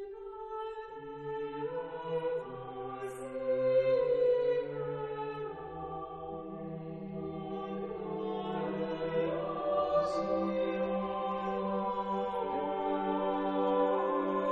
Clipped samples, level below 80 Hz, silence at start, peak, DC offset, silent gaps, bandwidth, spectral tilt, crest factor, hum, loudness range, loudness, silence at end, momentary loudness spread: under 0.1%; -62 dBFS; 0 s; -18 dBFS; under 0.1%; none; 8.2 kHz; -7.5 dB/octave; 14 dB; none; 7 LU; -34 LUFS; 0 s; 13 LU